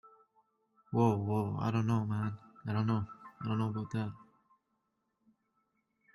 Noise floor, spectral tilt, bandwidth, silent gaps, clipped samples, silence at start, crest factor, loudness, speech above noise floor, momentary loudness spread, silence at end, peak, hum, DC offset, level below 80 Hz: -81 dBFS; -8.5 dB/octave; 12 kHz; none; under 0.1%; 0.05 s; 20 dB; -34 LUFS; 49 dB; 11 LU; 1.95 s; -16 dBFS; none; under 0.1%; -68 dBFS